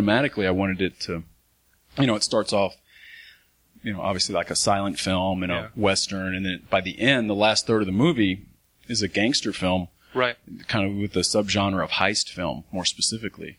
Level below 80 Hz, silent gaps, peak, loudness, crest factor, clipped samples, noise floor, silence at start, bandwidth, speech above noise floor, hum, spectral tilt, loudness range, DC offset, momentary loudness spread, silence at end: -54 dBFS; none; -4 dBFS; -24 LUFS; 22 dB; under 0.1%; -64 dBFS; 0 s; 15.5 kHz; 40 dB; none; -4 dB/octave; 4 LU; under 0.1%; 9 LU; 0.05 s